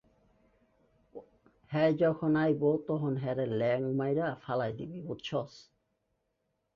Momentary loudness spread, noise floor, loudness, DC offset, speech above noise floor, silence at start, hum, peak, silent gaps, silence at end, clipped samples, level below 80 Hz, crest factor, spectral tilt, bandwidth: 17 LU; -80 dBFS; -31 LUFS; under 0.1%; 50 dB; 1.15 s; none; -16 dBFS; none; 1.15 s; under 0.1%; -68 dBFS; 16 dB; -8.5 dB/octave; 7 kHz